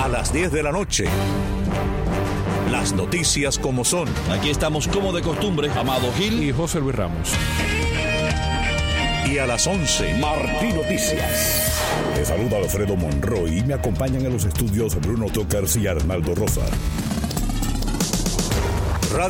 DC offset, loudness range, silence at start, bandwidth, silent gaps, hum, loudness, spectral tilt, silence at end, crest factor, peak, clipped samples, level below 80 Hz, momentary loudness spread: under 0.1%; 2 LU; 0 s; 17 kHz; none; none; -21 LUFS; -4.5 dB/octave; 0 s; 14 dB; -6 dBFS; under 0.1%; -28 dBFS; 4 LU